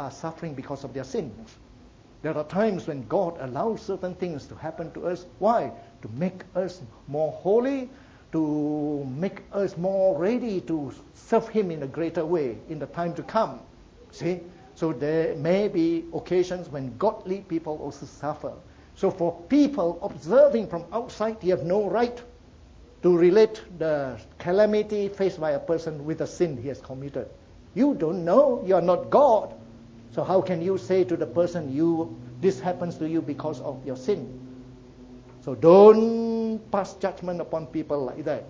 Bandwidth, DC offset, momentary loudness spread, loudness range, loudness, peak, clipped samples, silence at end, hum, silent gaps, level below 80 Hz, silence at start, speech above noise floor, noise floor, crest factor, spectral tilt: 7.6 kHz; under 0.1%; 15 LU; 8 LU; -25 LUFS; -2 dBFS; under 0.1%; 0 s; none; none; -56 dBFS; 0 s; 27 dB; -51 dBFS; 22 dB; -7.5 dB/octave